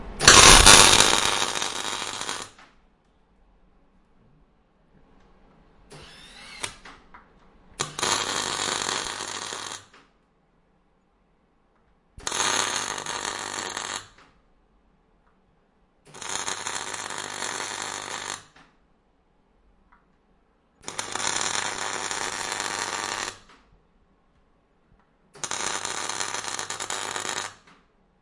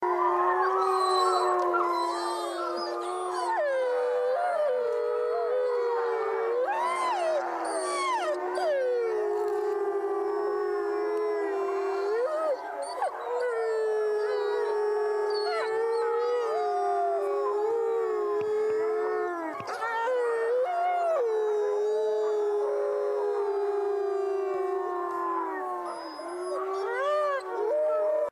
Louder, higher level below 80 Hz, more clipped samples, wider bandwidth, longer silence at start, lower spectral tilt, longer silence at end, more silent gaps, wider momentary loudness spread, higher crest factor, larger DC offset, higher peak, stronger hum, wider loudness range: first, -21 LUFS vs -28 LUFS; first, -40 dBFS vs -76 dBFS; neither; about the same, 12 kHz vs 13 kHz; about the same, 0 s vs 0 s; second, -0.5 dB/octave vs -3 dB/octave; first, 0.7 s vs 0 s; neither; first, 22 LU vs 6 LU; first, 26 dB vs 14 dB; neither; first, 0 dBFS vs -14 dBFS; neither; first, 10 LU vs 2 LU